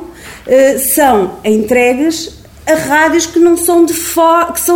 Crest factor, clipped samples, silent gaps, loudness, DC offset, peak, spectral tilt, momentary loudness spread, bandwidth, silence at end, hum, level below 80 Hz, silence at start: 10 dB; under 0.1%; none; -10 LUFS; under 0.1%; 0 dBFS; -3 dB/octave; 10 LU; 19.5 kHz; 0 s; none; -40 dBFS; 0 s